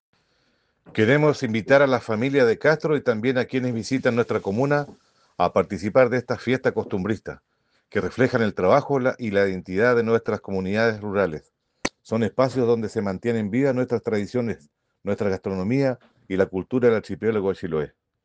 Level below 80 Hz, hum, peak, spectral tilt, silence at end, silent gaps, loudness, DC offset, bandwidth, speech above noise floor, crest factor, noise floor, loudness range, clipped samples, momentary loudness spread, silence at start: -58 dBFS; none; -4 dBFS; -7 dB/octave; 0.35 s; none; -23 LUFS; under 0.1%; 9 kHz; 45 dB; 20 dB; -67 dBFS; 4 LU; under 0.1%; 10 LU; 0.9 s